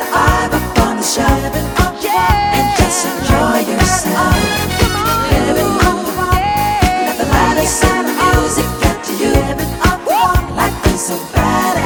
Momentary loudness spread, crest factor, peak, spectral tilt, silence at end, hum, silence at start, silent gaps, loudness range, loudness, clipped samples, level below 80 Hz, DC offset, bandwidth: 4 LU; 14 dB; 0 dBFS; -4.5 dB/octave; 0 s; none; 0 s; none; 1 LU; -13 LUFS; under 0.1%; -22 dBFS; under 0.1%; over 20 kHz